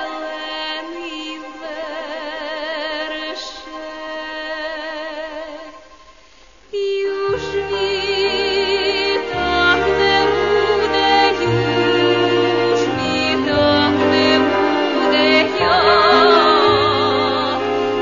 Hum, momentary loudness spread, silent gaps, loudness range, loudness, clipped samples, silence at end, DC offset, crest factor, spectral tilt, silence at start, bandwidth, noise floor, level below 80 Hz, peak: none; 15 LU; none; 13 LU; -16 LUFS; under 0.1%; 0 s; 0.4%; 16 dB; -4.5 dB/octave; 0 s; 7.4 kHz; -48 dBFS; -44 dBFS; -2 dBFS